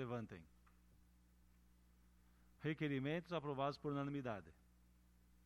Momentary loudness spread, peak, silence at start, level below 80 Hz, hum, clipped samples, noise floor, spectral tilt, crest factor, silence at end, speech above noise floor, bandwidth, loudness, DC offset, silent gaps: 9 LU; -30 dBFS; 0 s; -72 dBFS; 60 Hz at -70 dBFS; under 0.1%; -71 dBFS; -7.5 dB/octave; 18 dB; 0.9 s; 26 dB; 13.5 kHz; -45 LUFS; under 0.1%; none